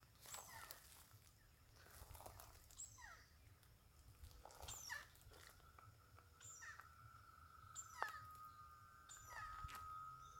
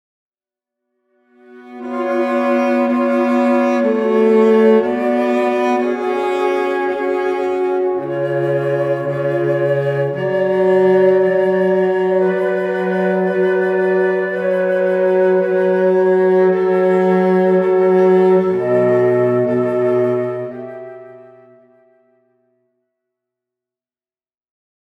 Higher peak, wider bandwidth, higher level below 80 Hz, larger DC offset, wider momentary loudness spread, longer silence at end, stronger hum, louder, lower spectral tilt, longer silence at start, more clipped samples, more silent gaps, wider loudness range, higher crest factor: second, -24 dBFS vs -2 dBFS; first, 16.5 kHz vs 7.6 kHz; about the same, -70 dBFS vs -66 dBFS; neither; first, 16 LU vs 6 LU; second, 0 s vs 3.75 s; neither; second, -57 LUFS vs -15 LUFS; second, -1.5 dB/octave vs -8 dB/octave; second, 0 s vs 1.5 s; neither; neither; about the same, 6 LU vs 5 LU; first, 34 dB vs 14 dB